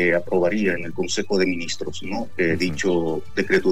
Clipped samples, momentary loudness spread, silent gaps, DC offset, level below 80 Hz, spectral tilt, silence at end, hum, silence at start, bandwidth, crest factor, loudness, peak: under 0.1%; 9 LU; none; 3%; -50 dBFS; -4.5 dB/octave; 0 s; none; 0 s; 14.5 kHz; 16 dB; -23 LUFS; -6 dBFS